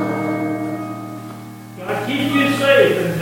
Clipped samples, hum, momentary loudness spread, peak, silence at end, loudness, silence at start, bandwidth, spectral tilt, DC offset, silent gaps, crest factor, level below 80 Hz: under 0.1%; none; 19 LU; 0 dBFS; 0 s; -18 LUFS; 0 s; 17 kHz; -5.5 dB/octave; under 0.1%; none; 18 dB; -56 dBFS